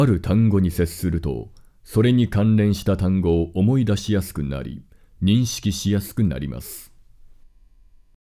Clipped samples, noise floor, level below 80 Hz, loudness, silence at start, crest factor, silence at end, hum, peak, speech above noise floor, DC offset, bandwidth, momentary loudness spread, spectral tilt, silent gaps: under 0.1%; -51 dBFS; -36 dBFS; -21 LUFS; 0 s; 14 dB; 1.5 s; none; -6 dBFS; 31 dB; under 0.1%; 16 kHz; 14 LU; -7 dB/octave; none